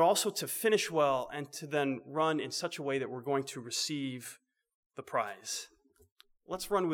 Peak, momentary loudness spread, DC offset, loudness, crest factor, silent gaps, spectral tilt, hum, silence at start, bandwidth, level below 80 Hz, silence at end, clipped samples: -14 dBFS; 12 LU; under 0.1%; -33 LUFS; 18 dB; 4.75-4.90 s, 6.12-6.16 s; -3.5 dB/octave; none; 0 s; over 20 kHz; -70 dBFS; 0 s; under 0.1%